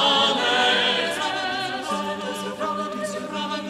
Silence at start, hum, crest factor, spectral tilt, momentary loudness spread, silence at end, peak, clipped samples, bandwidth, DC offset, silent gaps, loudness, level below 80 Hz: 0 s; none; 16 dB; -2.5 dB/octave; 11 LU; 0 s; -8 dBFS; under 0.1%; 20 kHz; under 0.1%; none; -23 LUFS; -64 dBFS